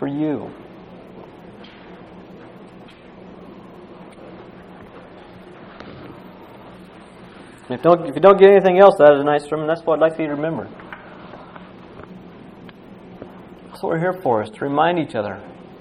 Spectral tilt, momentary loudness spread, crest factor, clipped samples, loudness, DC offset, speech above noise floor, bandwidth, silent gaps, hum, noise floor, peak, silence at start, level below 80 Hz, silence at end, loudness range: -7.5 dB/octave; 30 LU; 20 dB; under 0.1%; -16 LUFS; under 0.1%; 26 dB; 10.5 kHz; none; none; -42 dBFS; 0 dBFS; 0 s; -58 dBFS; 0.2 s; 26 LU